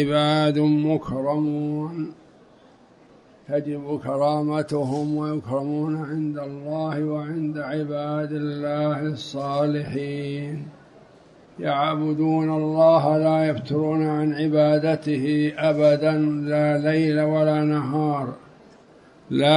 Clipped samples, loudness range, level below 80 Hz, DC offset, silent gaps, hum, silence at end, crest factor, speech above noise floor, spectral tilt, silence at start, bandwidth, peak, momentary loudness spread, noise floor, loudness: under 0.1%; 7 LU; -62 dBFS; under 0.1%; none; none; 0 s; 18 dB; 30 dB; -7.5 dB/octave; 0 s; 10.5 kHz; -4 dBFS; 10 LU; -52 dBFS; -23 LUFS